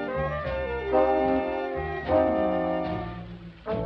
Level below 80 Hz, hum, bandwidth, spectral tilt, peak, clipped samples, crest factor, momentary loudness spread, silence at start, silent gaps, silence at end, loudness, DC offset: -44 dBFS; none; 6 kHz; -9 dB/octave; -10 dBFS; under 0.1%; 16 dB; 13 LU; 0 s; none; 0 s; -26 LUFS; under 0.1%